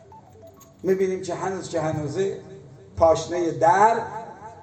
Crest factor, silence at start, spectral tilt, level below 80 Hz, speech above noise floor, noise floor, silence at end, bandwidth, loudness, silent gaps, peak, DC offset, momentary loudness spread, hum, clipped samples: 20 dB; 0.1 s; -5.5 dB/octave; -52 dBFS; 26 dB; -48 dBFS; 0 s; 15 kHz; -23 LUFS; none; -4 dBFS; under 0.1%; 19 LU; none; under 0.1%